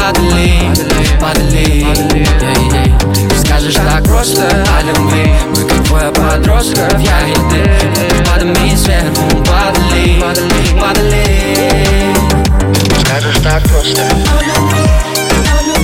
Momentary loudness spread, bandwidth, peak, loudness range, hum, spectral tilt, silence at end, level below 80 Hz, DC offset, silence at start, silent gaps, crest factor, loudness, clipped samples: 1 LU; 17 kHz; 0 dBFS; 0 LU; none; -4.5 dB/octave; 0 s; -12 dBFS; under 0.1%; 0 s; none; 8 dB; -10 LUFS; under 0.1%